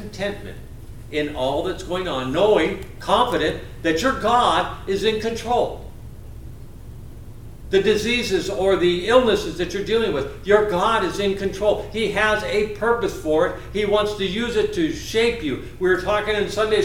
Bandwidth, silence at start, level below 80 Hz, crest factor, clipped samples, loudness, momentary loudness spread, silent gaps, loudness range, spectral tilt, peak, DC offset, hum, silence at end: 17 kHz; 0 s; -40 dBFS; 20 dB; under 0.1%; -21 LUFS; 22 LU; none; 4 LU; -4.5 dB/octave; -2 dBFS; under 0.1%; none; 0 s